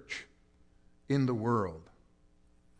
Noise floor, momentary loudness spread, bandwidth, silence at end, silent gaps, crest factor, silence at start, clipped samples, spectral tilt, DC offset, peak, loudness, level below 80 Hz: -64 dBFS; 13 LU; 9.8 kHz; 0.95 s; none; 18 dB; 0.1 s; under 0.1%; -7.5 dB/octave; under 0.1%; -18 dBFS; -33 LUFS; -64 dBFS